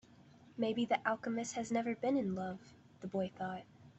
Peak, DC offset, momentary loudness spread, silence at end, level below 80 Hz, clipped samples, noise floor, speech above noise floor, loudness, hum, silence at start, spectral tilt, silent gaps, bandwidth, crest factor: -18 dBFS; under 0.1%; 14 LU; 0.05 s; -76 dBFS; under 0.1%; -62 dBFS; 24 dB; -38 LUFS; none; 0.5 s; -5 dB/octave; none; 8.2 kHz; 20 dB